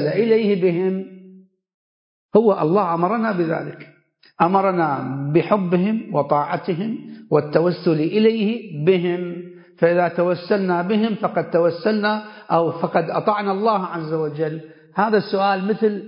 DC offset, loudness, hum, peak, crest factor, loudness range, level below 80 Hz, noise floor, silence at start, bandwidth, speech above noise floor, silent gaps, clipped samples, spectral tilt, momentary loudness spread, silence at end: under 0.1%; -20 LUFS; none; -2 dBFS; 18 dB; 2 LU; -68 dBFS; -47 dBFS; 0 s; 5.4 kHz; 28 dB; 1.74-2.29 s; under 0.1%; -12 dB/octave; 9 LU; 0 s